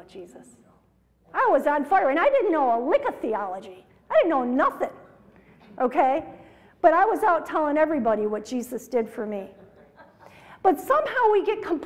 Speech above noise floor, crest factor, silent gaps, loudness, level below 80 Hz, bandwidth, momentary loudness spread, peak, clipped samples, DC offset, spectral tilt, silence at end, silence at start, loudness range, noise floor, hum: 39 dB; 20 dB; none; -23 LUFS; -62 dBFS; 16 kHz; 12 LU; -4 dBFS; under 0.1%; under 0.1%; -5 dB/octave; 0 s; 0.15 s; 4 LU; -62 dBFS; none